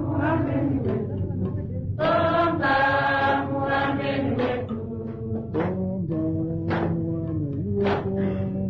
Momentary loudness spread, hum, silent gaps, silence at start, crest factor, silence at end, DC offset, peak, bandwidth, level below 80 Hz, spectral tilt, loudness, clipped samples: 8 LU; none; none; 0 s; 14 dB; 0 s; under 0.1%; -10 dBFS; 6 kHz; -46 dBFS; -9 dB/octave; -25 LUFS; under 0.1%